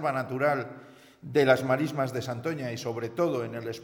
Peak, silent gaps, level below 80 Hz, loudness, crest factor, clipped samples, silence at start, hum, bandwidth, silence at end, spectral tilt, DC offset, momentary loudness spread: -8 dBFS; none; -70 dBFS; -28 LUFS; 22 dB; under 0.1%; 0 s; none; 18 kHz; 0 s; -6 dB/octave; under 0.1%; 12 LU